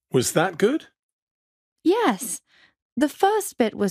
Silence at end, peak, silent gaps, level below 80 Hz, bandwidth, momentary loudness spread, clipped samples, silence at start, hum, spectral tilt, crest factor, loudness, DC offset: 0 s; -6 dBFS; 1.03-1.76 s, 2.82-2.96 s; -66 dBFS; 15.5 kHz; 10 LU; under 0.1%; 0.15 s; none; -4.5 dB/octave; 18 dB; -23 LUFS; under 0.1%